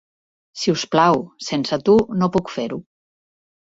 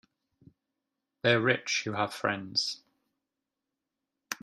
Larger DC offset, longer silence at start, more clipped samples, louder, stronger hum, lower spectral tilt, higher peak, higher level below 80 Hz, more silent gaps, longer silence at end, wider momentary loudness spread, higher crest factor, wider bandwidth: neither; second, 0.55 s vs 1.25 s; neither; first, -19 LUFS vs -29 LUFS; neither; first, -5.5 dB/octave vs -3.5 dB/octave; first, -2 dBFS vs -8 dBFS; first, -54 dBFS vs -74 dBFS; neither; first, 0.95 s vs 0.1 s; first, 12 LU vs 9 LU; about the same, 20 dB vs 24 dB; second, 8 kHz vs 15 kHz